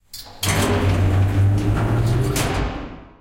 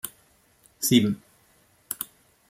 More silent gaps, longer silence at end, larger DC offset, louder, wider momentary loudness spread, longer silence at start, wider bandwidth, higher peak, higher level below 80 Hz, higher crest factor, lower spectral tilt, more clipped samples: neither; second, 0.15 s vs 0.45 s; neither; first, -20 LUFS vs -26 LUFS; second, 11 LU vs 16 LU; about the same, 0.15 s vs 0.05 s; about the same, 17 kHz vs 16.5 kHz; about the same, -6 dBFS vs -6 dBFS; first, -30 dBFS vs -68 dBFS; second, 12 dB vs 22 dB; first, -5.5 dB/octave vs -4 dB/octave; neither